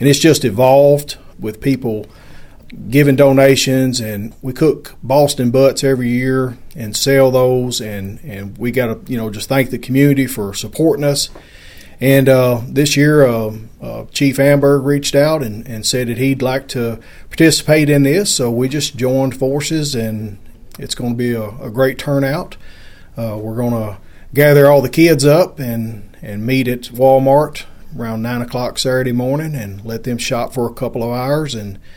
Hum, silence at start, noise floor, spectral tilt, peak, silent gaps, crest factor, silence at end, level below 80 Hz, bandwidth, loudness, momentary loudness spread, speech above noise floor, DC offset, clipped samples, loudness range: none; 0 s; -34 dBFS; -5.5 dB/octave; 0 dBFS; none; 14 dB; 0.05 s; -38 dBFS; 17.5 kHz; -14 LUFS; 16 LU; 20 dB; under 0.1%; under 0.1%; 6 LU